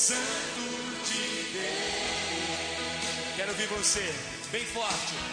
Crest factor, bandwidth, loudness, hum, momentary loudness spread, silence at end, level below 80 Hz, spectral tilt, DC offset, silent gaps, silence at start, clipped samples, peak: 20 dB; 10.5 kHz; -30 LUFS; none; 7 LU; 0 s; -56 dBFS; -1 dB/octave; under 0.1%; none; 0 s; under 0.1%; -12 dBFS